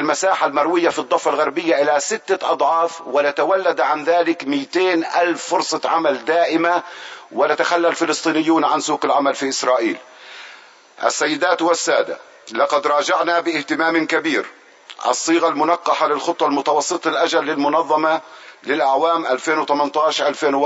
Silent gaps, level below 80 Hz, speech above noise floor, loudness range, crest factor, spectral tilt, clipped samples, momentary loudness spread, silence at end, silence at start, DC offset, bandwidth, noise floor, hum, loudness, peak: none; -76 dBFS; 26 dB; 2 LU; 18 dB; -2.5 dB/octave; under 0.1%; 6 LU; 0 s; 0 s; under 0.1%; 8 kHz; -44 dBFS; none; -18 LUFS; 0 dBFS